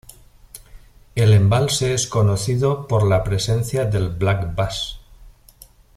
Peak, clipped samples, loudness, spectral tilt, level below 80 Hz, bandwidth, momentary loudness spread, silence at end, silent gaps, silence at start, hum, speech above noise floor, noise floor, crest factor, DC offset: -4 dBFS; under 0.1%; -19 LUFS; -5.5 dB/octave; -40 dBFS; 14 kHz; 8 LU; 0.7 s; none; 0.55 s; none; 29 dB; -48 dBFS; 16 dB; under 0.1%